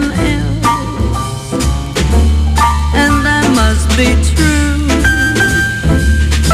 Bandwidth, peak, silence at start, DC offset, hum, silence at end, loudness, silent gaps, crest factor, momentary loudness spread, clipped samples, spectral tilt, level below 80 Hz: 15 kHz; 0 dBFS; 0 s; under 0.1%; none; 0 s; -12 LUFS; none; 10 dB; 5 LU; under 0.1%; -5 dB/octave; -14 dBFS